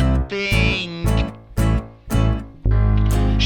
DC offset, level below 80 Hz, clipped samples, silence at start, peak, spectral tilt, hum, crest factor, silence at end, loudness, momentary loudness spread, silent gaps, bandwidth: under 0.1%; -22 dBFS; under 0.1%; 0 s; -6 dBFS; -6 dB/octave; none; 12 dB; 0 s; -20 LUFS; 7 LU; none; 17 kHz